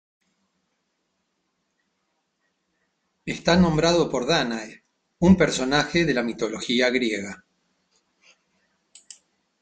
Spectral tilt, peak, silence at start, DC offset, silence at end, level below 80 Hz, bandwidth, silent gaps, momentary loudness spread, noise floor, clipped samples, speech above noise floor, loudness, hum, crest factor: -5 dB/octave; -4 dBFS; 3.25 s; under 0.1%; 2.25 s; -50 dBFS; 9.2 kHz; none; 15 LU; -75 dBFS; under 0.1%; 53 dB; -22 LUFS; none; 20 dB